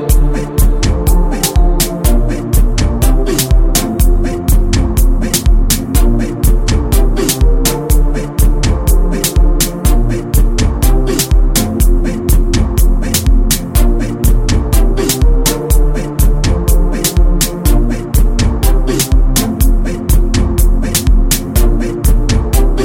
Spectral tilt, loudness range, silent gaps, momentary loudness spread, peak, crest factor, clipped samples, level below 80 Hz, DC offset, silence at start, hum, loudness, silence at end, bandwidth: -5 dB/octave; 0 LU; none; 2 LU; 0 dBFS; 10 dB; under 0.1%; -10 dBFS; under 0.1%; 0 s; none; -13 LUFS; 0 s; 17 kHz